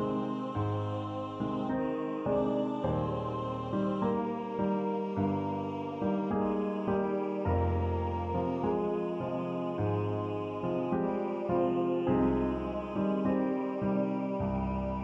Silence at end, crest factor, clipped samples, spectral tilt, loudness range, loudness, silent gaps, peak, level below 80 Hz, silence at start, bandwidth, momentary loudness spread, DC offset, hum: 0 s; 16 dB; under 0.1%; -9.5 dB/octave; 2 LU; -32 LUFS; none; -16 dBFS; -50 dBFS; 0 s; 7.4 kHz; 5 LU; under 0.1%; none